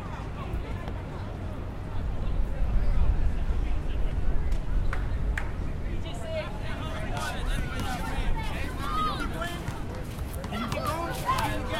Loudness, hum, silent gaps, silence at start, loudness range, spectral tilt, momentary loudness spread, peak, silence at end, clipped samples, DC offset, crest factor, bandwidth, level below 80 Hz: -32 LUFS; none; none; 0 s; 2 LU; -5.5 dB/octave; 8 LU; -10 dBFS; 0 s; under 0.1%; under 0.1%; 18 dB; 15.5 kHz; -30 dBFS